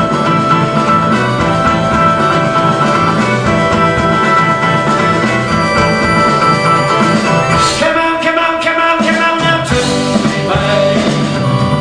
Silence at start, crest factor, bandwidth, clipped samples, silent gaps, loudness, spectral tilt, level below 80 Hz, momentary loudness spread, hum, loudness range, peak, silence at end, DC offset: 0 s; 10 dB; 10 kHz; under 0.1%; none; -11 LUFS; -5 dB/octave; -34 dBFS; 3 LU; none; 1 LU; 0 dBFS; 0 s; under 0.1%